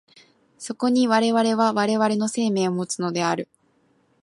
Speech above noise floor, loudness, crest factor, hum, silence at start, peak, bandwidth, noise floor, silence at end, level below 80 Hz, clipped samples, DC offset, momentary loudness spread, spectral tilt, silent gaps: 42 dB; -22 LUFS; 18 dB; none; 0.6 s; -6 dBFS; 11.5 kHz; -63 dBFS; 0.8 s; -74 dBFS; under 0.1%; under 0.1%; 10 LU; -4.5 dB/octave; none